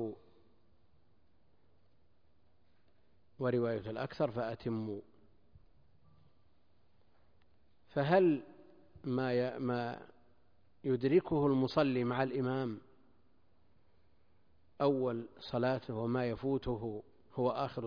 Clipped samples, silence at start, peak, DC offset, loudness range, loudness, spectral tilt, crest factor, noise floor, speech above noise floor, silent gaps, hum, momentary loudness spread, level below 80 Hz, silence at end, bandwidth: under 0.1%; 0 s; -16 dBFS; under 0.1%; 9 LU; -35 LUFS; -6.5 dB/octave; 20 dB; -74 dBFS; 40 dB; none; none; 13 LU; -64 dBFS; 0 s; 5.2 kHz